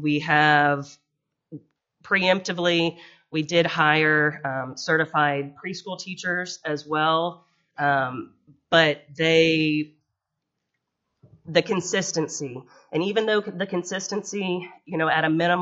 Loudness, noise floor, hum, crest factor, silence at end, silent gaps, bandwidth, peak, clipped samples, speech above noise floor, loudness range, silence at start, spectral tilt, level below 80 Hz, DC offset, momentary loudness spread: -23 LUFS; -81 dBFS; none; 22 dB; 0 s; none; 8 kHz; -2 dBFS; under 0.1%; 58 dB; 4 LU; 0 s; -3 dB/octave; -68 dBFS; under 0.1%; 13 LU